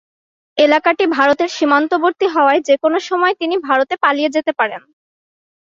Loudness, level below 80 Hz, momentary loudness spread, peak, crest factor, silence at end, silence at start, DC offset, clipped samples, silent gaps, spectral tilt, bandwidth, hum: -15 LUFS; -66 dBFS; 6 LU; -2 dBFS; 14 dB; 0.95 s; 0.55 s; under 0.1%; under 0.1%; none; -3 dB/octave; 7.6 kHz; none